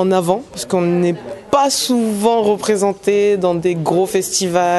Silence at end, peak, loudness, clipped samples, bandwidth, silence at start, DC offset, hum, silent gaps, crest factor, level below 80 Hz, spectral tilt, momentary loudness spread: 0 s; -2 dBFS; -16 LUFS; under 0.1%; 12.5 kHz; 0 s; under 0.1%; none; none; 14 dB; -54 dBFS; -4.5 dB/octave; 5 LU